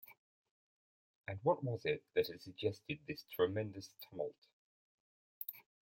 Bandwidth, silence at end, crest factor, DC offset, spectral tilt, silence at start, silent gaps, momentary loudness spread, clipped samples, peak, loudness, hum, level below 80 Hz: 16.5 kHz; 0.4 s; 22 dB; under 0.1%; -6.5 dB/octave; 0.1 s; 0.18-0.45 s, 0.51-1.22 s, 4.38-4.42 s, 4.53-5.41 s; 14 LU; under 0.1%; -20 dBFS; -41 LUFS; none; -78 dBFS